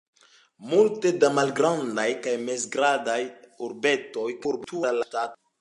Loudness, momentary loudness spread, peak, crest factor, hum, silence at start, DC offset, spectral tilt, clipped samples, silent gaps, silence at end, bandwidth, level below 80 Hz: -25 LUFS; 10 LU; -6 dBFS; 18 dB; none; 0.6 s; under 0.1%; -4 dB/octave; under 0.1%; none; 0.25 s; 11.5 kHz; -76 dBFS